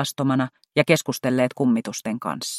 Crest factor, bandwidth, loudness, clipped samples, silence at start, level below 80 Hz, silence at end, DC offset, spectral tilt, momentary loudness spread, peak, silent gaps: 20 dB; 15.5 kHz; -22 LUFS; under 0.1%; 0 s; -66 dBFS; 0 s; under 0.1%; -5 dB/octave; 8 LU; -2 dBFS; none